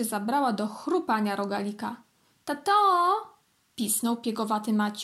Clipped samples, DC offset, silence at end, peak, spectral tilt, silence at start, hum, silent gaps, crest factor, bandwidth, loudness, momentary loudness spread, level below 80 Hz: under 0.1%; under 0.1%; 0 s; -12 dBFS; -4 dB/octave; 0 s; none; none; 16 dB; 16 kHz; -27 LUFS; 14 LU; -80 dBFS